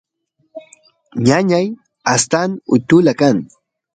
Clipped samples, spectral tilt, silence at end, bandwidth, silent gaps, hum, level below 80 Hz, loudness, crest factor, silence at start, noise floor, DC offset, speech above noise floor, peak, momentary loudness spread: under 0.1%; -5 dB/octave; 0.5 s; 9.6 kHz; none; none; -54 dBFS; -15 LUFS; 16 dB; 0.55 s; -65 dBFS; under 0.1%; 51 dB; 0 dBFS; 10 LU